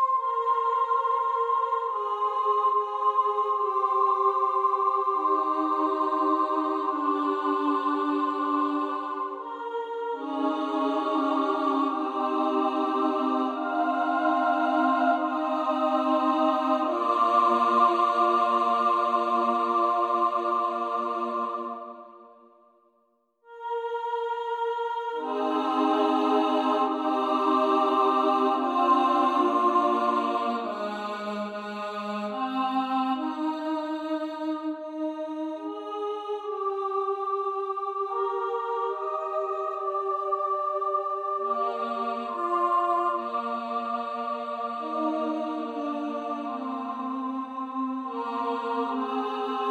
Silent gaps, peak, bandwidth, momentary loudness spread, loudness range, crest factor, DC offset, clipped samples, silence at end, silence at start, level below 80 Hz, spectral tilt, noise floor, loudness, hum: none; -10 dBFS; 11.5 kHz; 9 LU; 8 LU; 18 dB; under 0.1%; under 0.1%; 0 s; 0 s; -76 dBFS; -5 dB/octave; -69 dBFS; -26 LUFS; none